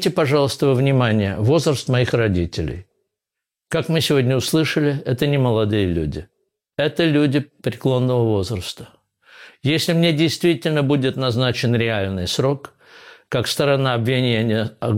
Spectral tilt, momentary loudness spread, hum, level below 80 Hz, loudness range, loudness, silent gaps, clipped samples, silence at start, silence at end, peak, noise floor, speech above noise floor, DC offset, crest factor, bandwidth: -6 dB/octave; 9 LU; none; -44 dBFS; 2 LU; -19 LUFS; none; under 0.1%; 0 s; 0 s; -6 dBFS; -85 dBFS; 66 dB; under 0.1%; 12 dB; 16.5 kHz